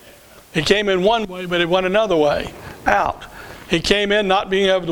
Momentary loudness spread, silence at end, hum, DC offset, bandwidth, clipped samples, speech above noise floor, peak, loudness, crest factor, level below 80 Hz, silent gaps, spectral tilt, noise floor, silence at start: 9 LU; 0 s; none; under 0.1%; 19.5 kHz; under 0.1%; 27 dB; 0 dBFS; -18 LUFS; 18 dB; -42 dBFS; none; -4.5 dB/octave; -45 dBFS; 0.05 s